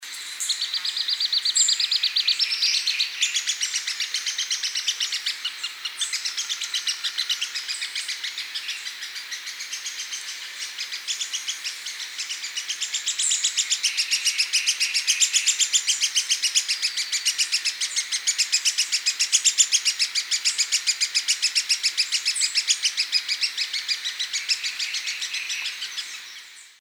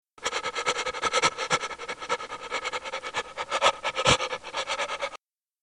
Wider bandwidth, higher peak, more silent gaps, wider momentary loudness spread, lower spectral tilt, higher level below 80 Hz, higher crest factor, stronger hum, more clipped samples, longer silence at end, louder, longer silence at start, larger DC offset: first, over 20 kHz vs 12 kHz; about the same, -4 dBFS vs -6 dBFS; neither; about the same, 11 LU vs 10 LU; second, 6.5 dB/octave vs -1.5 dB/octave; second, under -90 dBFS vs -56 dBFS; about the same, 22 dB vs 24 dB; neither; neither; second, 0.1 s vs 0.45 s; first, -22 LUFS vs -28 LUFS; second, 0 s vs 0.2 s; neither